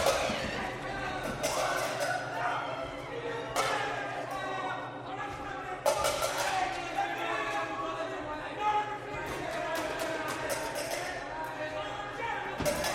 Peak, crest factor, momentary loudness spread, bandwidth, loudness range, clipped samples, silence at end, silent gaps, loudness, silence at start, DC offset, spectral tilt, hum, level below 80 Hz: -14 dBFS; 20 dB; 7 LU; 16.5 kHz; 2 LU; under 0.1%; 0 s; none; -33 LUFS; 0 s; under 0.1%; -3 dB/octave; none; -56 dBFS